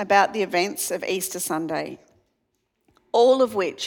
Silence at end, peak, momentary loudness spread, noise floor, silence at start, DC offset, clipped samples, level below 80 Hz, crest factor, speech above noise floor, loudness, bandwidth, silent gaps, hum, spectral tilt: 0 s; -4 dBFS; 10 LU; -74 dBFS; 0 s; under 0.1%; under 0.1%; -70 dBFS; 20 dB; 52 dB; -22 LUFS; 19 kHz; none; none; -3 dB/octave